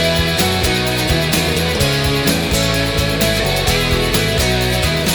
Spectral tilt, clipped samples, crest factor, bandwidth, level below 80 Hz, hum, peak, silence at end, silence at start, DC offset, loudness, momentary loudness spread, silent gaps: -4 dB/octave; under 0.1%; 14 dB; over 20 kHz; -26 dBFS; none; -2 dBFS; 0 s; 0 s; under 0.1%; -15 LUFS; 1 LU; none